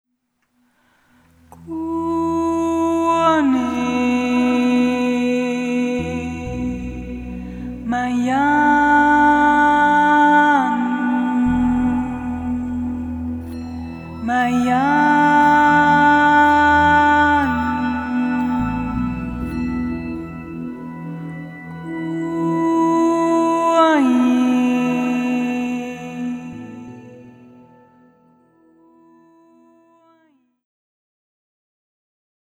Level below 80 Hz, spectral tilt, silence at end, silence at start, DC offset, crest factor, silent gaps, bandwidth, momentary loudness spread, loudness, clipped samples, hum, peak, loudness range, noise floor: -40 dBFS; -6 dB/octave; 5.25 s; 1.6 s; under 0.1%; 14 dB; none; 11 kHz; 17 LU; -17 LUFS; under 0.1%; none; -4 dBFS; 11 LU; -70 dBFS